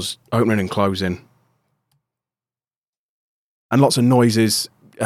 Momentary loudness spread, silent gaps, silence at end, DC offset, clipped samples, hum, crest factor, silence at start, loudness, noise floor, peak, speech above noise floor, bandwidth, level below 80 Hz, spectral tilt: 11 LU; 2.76-3.69 s; 0 s; under 0.1%; under 0.1%; none; 18 dB; 0 s; -18 LUFS; under -90 dBFS; -2 dBFS; over 73 dB; 16 kHz; -60 dBFS; -5 dB/octave